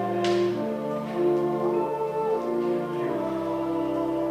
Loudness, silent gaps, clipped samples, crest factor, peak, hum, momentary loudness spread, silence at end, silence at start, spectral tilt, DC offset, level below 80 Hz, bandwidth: -27 LUFS; none; under 0.1%; 12 dB; -14 dBFS; none; 4 LU; 0 s; 0 s; -7 dB/octave; under 0.1%; -60 dBFS; 11 kHz